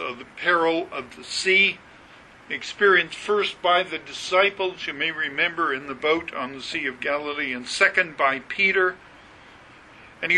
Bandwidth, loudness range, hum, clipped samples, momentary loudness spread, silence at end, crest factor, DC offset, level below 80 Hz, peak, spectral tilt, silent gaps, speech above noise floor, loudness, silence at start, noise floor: 11 kHz; 2 LU; none; under 0.1%; 13 LU; 0 s; 20 dB; under 0.1%; -62 dBFS; -4 dBFS; -2.5 dB/octave; none; 25 dB; -22 LUFS; 0 s; -48 dBFS